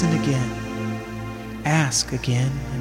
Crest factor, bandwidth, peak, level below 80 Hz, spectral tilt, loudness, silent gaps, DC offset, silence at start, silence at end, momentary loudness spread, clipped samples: 14 dB; 16 kHz; -8 dBFS; -42 dBFS; -4.5 dB/octave; -24 LUFS; none; under 0.1%; 0 s; 0 s; 12 LU; under 0.1%